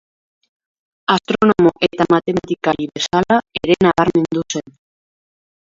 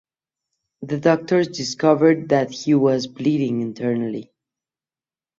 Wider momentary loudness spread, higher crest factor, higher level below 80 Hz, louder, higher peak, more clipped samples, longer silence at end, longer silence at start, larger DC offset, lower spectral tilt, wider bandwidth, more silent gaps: about the same, 8 LU vs 10 LU; about the same, 18 dB vs 18 dB; first, -48 dBFS vs -64 dBFS; first, -16 LUFS vs -20 LUFS; first, 0 dBFS vs -4 dBFS; neither; about the same, 1.15 s vs 1.15 s; first, 1.1 s vs 0.8 s; neither; about the same, -5.5 dB/octave vs -6 dB/octave; about the same, 7.6 kHz vs 7.8 kHz; neither